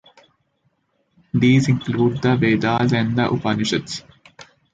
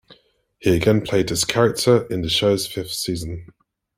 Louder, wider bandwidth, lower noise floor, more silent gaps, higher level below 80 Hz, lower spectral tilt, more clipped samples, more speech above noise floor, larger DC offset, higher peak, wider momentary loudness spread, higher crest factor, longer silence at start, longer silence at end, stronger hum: about the same, -19 LUFS vs -20 LUFS; second, 9.2 kHz vs 16.5 kHz; first, -67 dBFS vs -57 dBFS; neither; about the same, -50 dBFS vs -46 dBFS; first, -6.5 dB/octave vs -4.5 dB/octave; neither; first, 49 dB vs 37 dB; neither; about the same, -4 dBFS vs -2 dBFS; about the same, 9 LU vs 8 LU; about the same, 16 dB vs 20 dB; first, 1.35 s vs 0.1 s; second, 0.3 s vs 0.5 s; neither